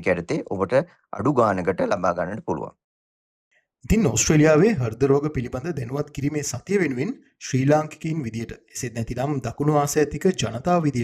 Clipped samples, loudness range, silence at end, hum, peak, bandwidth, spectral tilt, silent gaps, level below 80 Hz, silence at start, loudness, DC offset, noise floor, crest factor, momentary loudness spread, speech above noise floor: under 0.1%; 4 LU; 0 s; none; -4 dBFS; 15.5 kHz; -5.5 dB/octave; 2.84-3.51 s; -44 dBFS; 0 s; -23 LUFS; under 0.1%; under -90 dBFS; 18 dB; 12 LU; over 68 dB